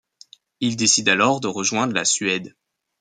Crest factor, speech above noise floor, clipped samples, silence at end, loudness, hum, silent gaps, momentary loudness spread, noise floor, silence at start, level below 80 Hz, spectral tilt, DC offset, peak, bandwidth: 20 dB; 30 dB; under 0.1%; 0.5 s; -19 LUFS; none; none; 10 LU; -51 dBFS; 0.6 s; -66 dBFS; -2 dB/octave; under 0.1%; -2 dBFS; 10 kHz